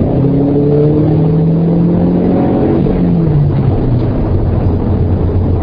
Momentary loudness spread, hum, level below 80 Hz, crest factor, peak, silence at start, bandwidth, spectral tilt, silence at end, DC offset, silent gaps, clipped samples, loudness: 3 LU; none; -22 dBFS; 10 dB; 0 dBFS; 0 s; 5.2 kHz; -13 dB/octave; 0 s; under 0.1%; none; under 0.1%; -11 LUFS